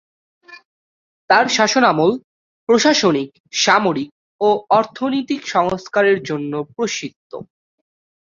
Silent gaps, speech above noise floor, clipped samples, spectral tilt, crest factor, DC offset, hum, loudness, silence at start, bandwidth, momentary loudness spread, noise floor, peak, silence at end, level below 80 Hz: 0.65-1.28 s, 2.24-2.67 s, 3.40-3.44 s, 4.12-4.39 s, 7.16-7.30 s; over 73 dB; under 0.1%; -3.5 dB/octave; 18 dB; under 0.1%; none; -17 LUFS; 0.5 s; 7.6 kHz; 15 LU; under -90 dBFS; -2 dBFS; 0.85 s; -60 dBFS